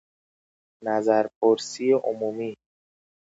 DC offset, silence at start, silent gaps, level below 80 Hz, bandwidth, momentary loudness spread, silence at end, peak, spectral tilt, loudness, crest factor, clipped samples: under 0.1%; 0.8 s; 1.36-1.41 s; -78 dBFS; 8 kHz; 11 LU; 0.7 s; -6 dBFS; -4.5 dB/octave; -24 LUFS; 18 dB; under 0.1%